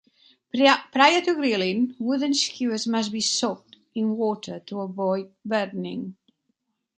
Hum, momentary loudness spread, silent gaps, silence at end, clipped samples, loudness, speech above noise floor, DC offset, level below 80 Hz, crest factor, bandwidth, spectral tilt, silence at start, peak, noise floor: none; 15 LU; none; 0.85 s; under 0.1%; -24 LUFS; 52 dB; under 0.1%; -74 dBFS; 22 dB; 9.6 kHz; -3.5 dB/octave; 0.55 s; -2 dBFS; -75 dBFS